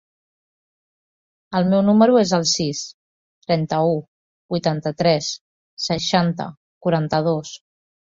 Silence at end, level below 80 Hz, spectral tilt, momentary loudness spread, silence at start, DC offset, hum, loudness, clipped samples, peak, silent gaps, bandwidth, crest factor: 0.55 s; -58 dBFS; -5 dB/octave; 16 LU; 1.5 s; under 0.1%; none; -20 LUFS; under 0.1%; -2 dBFS; 2.94-3.41 s, 4.08-4.49 s, 5.41-5.77 s, 6.57-6.81 s; 7.8 kHz; 18 dB